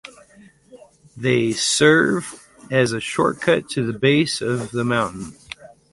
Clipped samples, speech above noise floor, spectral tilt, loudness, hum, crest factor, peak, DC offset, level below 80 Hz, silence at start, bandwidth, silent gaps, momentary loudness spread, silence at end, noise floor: under 0.1%; 31 dB; -4.5 dB/octave; -19 LUFS; none; 18 dB; -2 dBFS; under 0.1%; -56 dBFS; 0.05 s; 11.5 kHz; none; 20 LU; 0.25 s; -50 dBFS